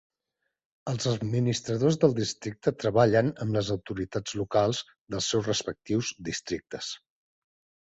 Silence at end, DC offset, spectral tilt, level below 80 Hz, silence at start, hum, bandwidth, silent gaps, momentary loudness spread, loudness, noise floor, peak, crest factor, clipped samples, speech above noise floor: 0.95 s; under 0.1%; -5 dB/octave; -58 dBFS; 0.85 s; none; 8.2 kHz; 5.01-5.06 s; 12 LU; -28 LUFS; -82 dBFS; -6 dBFS; 22 dB; under 0.1%; 55 dB